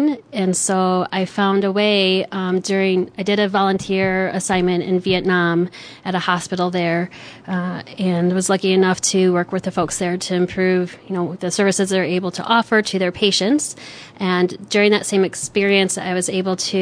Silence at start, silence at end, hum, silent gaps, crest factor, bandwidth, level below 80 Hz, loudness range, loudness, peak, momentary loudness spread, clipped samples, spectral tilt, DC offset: 0 s; 0 s; none; none; 16 dB; 11 kHz; -54 dBFS; 2 LU; -18 LUFS; -2 dBFS; 8 LU; under 0.1%; -4.5 dB/octave; under 0.1%